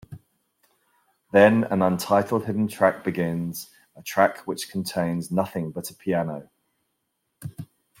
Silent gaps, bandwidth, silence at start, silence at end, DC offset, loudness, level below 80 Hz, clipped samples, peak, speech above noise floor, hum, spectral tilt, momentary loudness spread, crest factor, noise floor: none; 16.5 kHz; 0.1 s; 0.35 s; under 0.1%; -24 LUFS; -64 dBFS; under 0.1%; -2 dBFS; 53 dB; none; -6 dB/octave; 21 LU; 22 dB; -76 dBFS